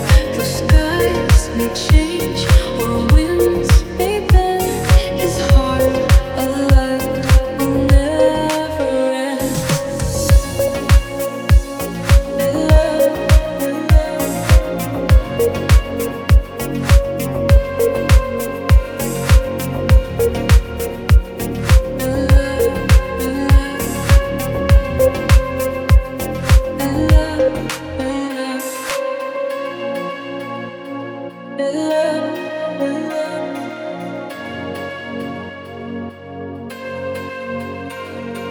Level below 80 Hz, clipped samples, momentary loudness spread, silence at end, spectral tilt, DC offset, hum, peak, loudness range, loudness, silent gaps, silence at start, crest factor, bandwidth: -18 dBFS; under 0.1%; 12 LU; 0 s; -6 dB/octave; under 0.1%; none; 0 dBFS; 9 LU; -16 LUFS; none; 0 s; 14 dB; over 20 kHz